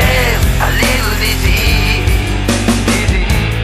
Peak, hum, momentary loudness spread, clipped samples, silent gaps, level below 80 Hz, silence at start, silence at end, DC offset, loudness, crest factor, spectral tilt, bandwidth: 0 dBFS; none; 3 LU; under 0.1%; none; -16 dBFS; 0 s; 0 s; under 0.1%; -13 LUFS; 12 dB; -4.5 dB/octave; 16 kHz